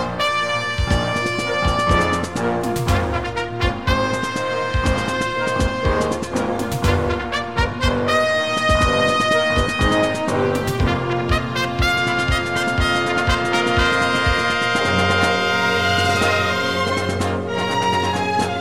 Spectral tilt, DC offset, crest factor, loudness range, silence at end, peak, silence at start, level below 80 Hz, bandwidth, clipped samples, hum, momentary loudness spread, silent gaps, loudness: -4.5 dB/octave; 0.7%; 16 dB; 3 LU; 0 s; -2 dBFS; 0 s; -30 dBFS; 16.5 kHz; under 0.1%; none; 5 LU; none; -19 LUFS